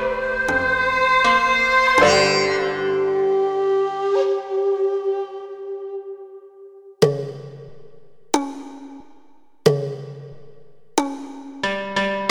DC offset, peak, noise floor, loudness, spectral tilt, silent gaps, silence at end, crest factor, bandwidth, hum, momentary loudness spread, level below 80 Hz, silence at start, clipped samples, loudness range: under 0.1%; -2 dBFS; -55 dBFS; -19 LUFS; -4 dB/octave; none; 0 s; 20 dB; 16.5 kHz; none; 21 LU; -50 dBFS; 0 s; under 0.1%; 10 LU